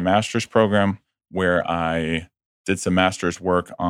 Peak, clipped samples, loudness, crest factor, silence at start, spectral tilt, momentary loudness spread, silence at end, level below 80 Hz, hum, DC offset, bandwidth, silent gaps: -2 dBFS; under 0.1%; -21 LUFS; 20 dB; 0 s; -5 dB/octave; 9 LU; 0 s; -48 dBFS; none; under 0.1%; 14 kHz; 2.46-2.65 s